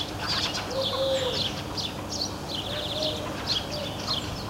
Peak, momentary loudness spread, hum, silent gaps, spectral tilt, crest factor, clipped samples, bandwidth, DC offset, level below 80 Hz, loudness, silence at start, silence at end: -14 dBFS; 5 LU; none; none; -3.5 dB/octave; 16 dB; under 0.1%; 16 kHz; under 0.1%; -46 dBFS; -28 LUFS; 0 s; 0 s